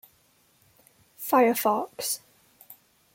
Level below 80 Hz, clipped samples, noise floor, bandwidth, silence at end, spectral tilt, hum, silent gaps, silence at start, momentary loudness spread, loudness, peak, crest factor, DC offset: -78 dBFS; under 0.1%; -64 dBFS; 17 kHz; 0.4 s; -3 dB/octave; none; none; 1.2 s; 12 LU; -25 LUFS; -10 dBFS; 20 dB; under 0.1%